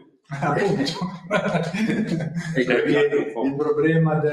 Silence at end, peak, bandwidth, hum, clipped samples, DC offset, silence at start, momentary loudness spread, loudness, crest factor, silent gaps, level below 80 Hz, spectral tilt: 0 s; -4 dBFS; 11.5 kHz; none; under 0.1%; under 0.1%; 0.3 s; 7 LU; -22 LUFS; 18 dB; none; -58 dBFS; -6.5 dB/octave